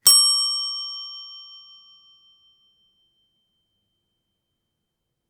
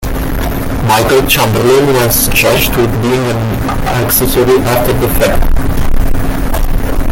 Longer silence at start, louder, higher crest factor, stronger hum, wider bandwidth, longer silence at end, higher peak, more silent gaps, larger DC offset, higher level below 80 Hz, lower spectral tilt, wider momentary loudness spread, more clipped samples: about the same, 0.05 s vs 0 s; second, -18 LUFS vs -11 LUFS; first, 26 dB vs 10 dB; neither; first, 19.5 kHz vs 17.5 kHz; first, 3.75 s vs 0 s; about the same, 0 dBFS vs 0 dBFS; neither; neither; second, -84 dBFS vs -16 dBFS; second, 3.5 dB/octave vs -4.5 dB/octave; first, 26 LU vs 8 LU; neither